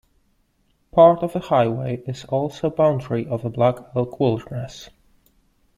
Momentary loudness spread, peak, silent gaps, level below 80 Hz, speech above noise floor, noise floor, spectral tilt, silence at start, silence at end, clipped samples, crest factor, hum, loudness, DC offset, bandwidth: 15 LU; -2 dBFS; none; -54 dBFS; 45 dB; -65 dBFS; -8 dB/octave; 0.95 s; 0.95 s; under 0.1%; 20 dB; none; -21 LUFS; under 0.1%; 11.5 kHz